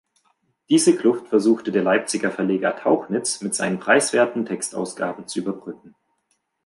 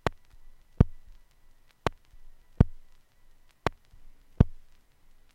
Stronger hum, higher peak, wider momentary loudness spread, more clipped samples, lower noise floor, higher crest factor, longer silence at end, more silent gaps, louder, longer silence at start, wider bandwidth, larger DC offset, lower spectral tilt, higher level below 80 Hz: neither; about the same, -2 dBFS vs -2 dBFS; about the same, 10 LU vs 8 LU; neither; first, -71 dBFS vs -57 dBFS; second, 20 dB vs 28 dB; about the same, 0.75 s vs 0.8 s; neither; first, -21 LUFS vs -30 LUFS; first, 0.7 s vs 0.05 s; about the same, 11.5 kHz vs 11.5 kHz; neither; second, -4 dB/octave vs -8 dB/octave; second, -70 dBFS vs -36 dBFS